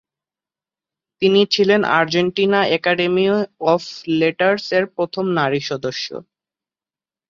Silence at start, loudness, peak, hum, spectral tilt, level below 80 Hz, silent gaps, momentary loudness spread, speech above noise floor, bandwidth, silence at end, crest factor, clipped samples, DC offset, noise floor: 1.2 s; -18 LUFS; -2 dBFS; none; -5.5 dB/octave; -62 dBFS; none; 9 LU; over 73 dB; 7.4 kHz; 1.1 s; 16 dB; under 0.1%; under 0.1%; under -90 dBFS